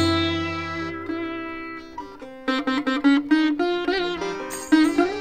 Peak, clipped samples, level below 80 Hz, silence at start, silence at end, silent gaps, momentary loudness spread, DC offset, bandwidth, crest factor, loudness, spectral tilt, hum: -6 dBFS; under 0.1%; -52 dBFS; 0 s; 0 s; none; 15 LU; 0.2%; 15.5 kHz; 18 dB; -23 LUFS; -5 dB/octave; none